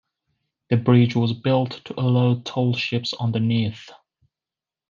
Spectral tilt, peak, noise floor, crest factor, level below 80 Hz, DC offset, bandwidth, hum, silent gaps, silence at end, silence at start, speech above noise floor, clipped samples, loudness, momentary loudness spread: -7.5 dB/octave; -4 dBFS; -90 dBFS; 18 dB; -66 dBFS; under 0.1%; 7.2 kHz; none; none; 1 s; 0.7 s; 69 dB; under 0.1%; -21 LUFS; 8 LU